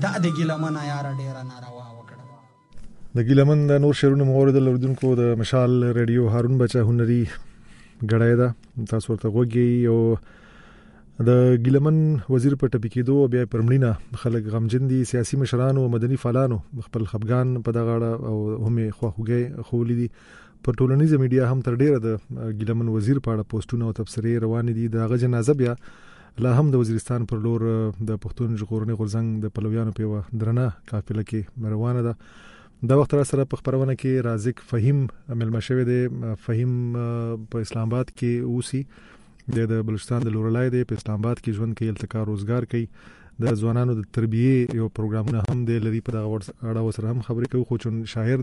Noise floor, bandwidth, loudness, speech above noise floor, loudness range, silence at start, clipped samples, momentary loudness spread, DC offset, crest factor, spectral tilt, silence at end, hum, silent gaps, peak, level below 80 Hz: -49 dBFS; 11.5 kHz; -23 LUFS; 27 dB; 6 LU; 0 s; under 0.1%; 10 LU; under 0.1%; 16 dB; -8 dB/octave; 0 s; none; none; -6 dBFS; -48 dBFS